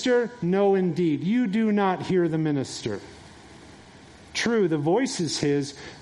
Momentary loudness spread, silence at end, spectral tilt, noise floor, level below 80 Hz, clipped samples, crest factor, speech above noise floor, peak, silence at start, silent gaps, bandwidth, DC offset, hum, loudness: 10 LU; 0 s; -5.5 dB/octave; -48 dBFS; -62 dBFS; under 0.1%; 16 dB; 24 dB; -10 dBFS; 0 s; none; 11.5 kHz; under 0.1%; none; -24 LUFS